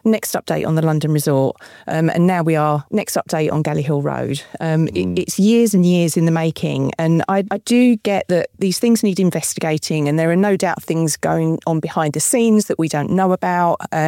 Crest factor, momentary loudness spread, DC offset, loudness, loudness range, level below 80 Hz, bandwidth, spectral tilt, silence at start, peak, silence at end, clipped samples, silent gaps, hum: 12 dB; 6 LU; under 0.1%; -17 LUFS; 2 LU; -56 dBFS; 17 kHz; -5.5 dB/octave; 0.05 s; -6 dBFS; 0 s; under 0.1%; none; none